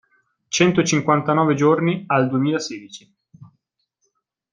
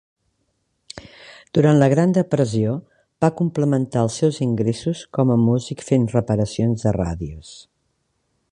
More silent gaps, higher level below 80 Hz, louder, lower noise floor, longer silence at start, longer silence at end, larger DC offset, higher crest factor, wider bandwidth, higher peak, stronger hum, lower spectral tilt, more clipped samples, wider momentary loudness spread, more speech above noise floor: neither; second, -62 dBFS vs -46 dBFS; about the same, -19 LUFS vs -20 LUFS; about the same, -72 dBFS vs -70 dBFS; second, 0.5 s vs 0.95 s; first, 1.1 s vs 0.95 s; neither; about the same, 20 dB vs 18 dB; about the same, 10 kHz vs 10.5 kHz; about the same, -2 dBFS vs -2 dBFS; neither; second, -5 dB/octave vs -7.5 dB/octave; neither; second, 11 LU vs 16 LU; about the same, 54 dB vs 51 dB